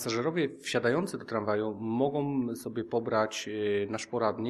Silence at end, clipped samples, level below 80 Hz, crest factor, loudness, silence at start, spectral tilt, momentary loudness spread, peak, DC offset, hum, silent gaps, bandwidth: 0 s; under 0.1%; -70 dBFS; 18 dB; -31 LUFS; 0 s; -5 dB/octave; 5 LU; -12 dBFS; under 0.1%; none; none; 13.5 kHz